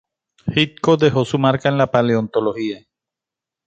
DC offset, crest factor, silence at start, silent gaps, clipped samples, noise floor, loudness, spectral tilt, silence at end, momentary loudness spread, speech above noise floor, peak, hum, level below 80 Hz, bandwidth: under 0.1%; 18 dB; 0.45 s; none; under 0.1%; -87 dBFS; -18 LUFS; -6.5 dB/octave; 0.9 s; 11 LU; 70 dB; 0 dBFS; none; -52 dBFS; 8.6 kHz